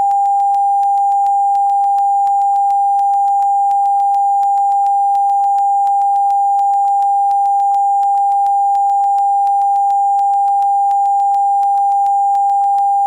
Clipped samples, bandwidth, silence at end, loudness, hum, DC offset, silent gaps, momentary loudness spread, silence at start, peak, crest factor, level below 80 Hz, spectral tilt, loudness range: under 0.1%; 9.4 kHz; 0 s; -13 LUFS; none; under 0.1%; none; 0 LU; 0 s; -8 dBFS; 4 dB; -72 dBFS; -0.5 dB/octave; 0 LU